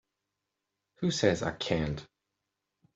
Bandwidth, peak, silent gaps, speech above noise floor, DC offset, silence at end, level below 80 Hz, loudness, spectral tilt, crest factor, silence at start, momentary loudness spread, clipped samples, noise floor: 8.2 kHz; -10 dBFS; none; 56 dB; under 0.1%; 0.9 s; -56 dBFS; -31 LUFS; -5 dB/octave; 24 dB; 1 s; 8 LU; under 0.1%; -86 dBFS